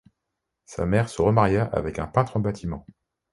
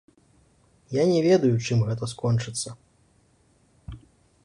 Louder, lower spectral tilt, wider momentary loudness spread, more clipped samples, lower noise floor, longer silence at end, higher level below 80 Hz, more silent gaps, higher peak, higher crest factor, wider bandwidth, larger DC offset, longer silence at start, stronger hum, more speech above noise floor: about the same, -24 LUFS vs -24 LUFS; about the same, -7.5 dB/octave vs -6.5 dB/octave; second, 13 LU vs 22 LU; neither; first, -82 dBFS vs -62 dBFS; about the same, 0.55 s vs 0.45 s; first, -44 dBFS vs -54 dBFS; neither; first, -4 dBFS vs -10 dBFS; about the same, 20 dB vs 18 dB; about the same, 11.5 kHz vs 11.5 kHz; neither; second, 0.7 s vs 0.9 s; neither; first, 59 dB vs 40 dB